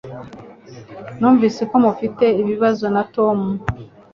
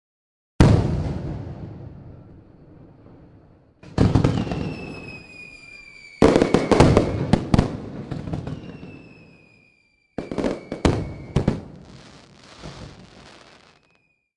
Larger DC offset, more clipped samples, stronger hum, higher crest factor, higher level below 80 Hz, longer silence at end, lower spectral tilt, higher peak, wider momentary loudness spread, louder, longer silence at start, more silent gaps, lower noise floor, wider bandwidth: neither; neither; neither; second, 16 dB vs 24 dB; second, -48 dBFS vs -36 dBFS; second, 0.25 s vs 1.45 s; about the same, -8 dB/octave vs -7 dB/octave; about the same, -2 dBFS vs 0 dBFS; second, 20 LU vs 25 LU; first, -17 LUFS vs -21 LUFS; second, 0.05 s vs 0.6 s; neither; second, -39 dBFS vs -65 dBFS; second, 7.2 kHz vs 11.5 kHz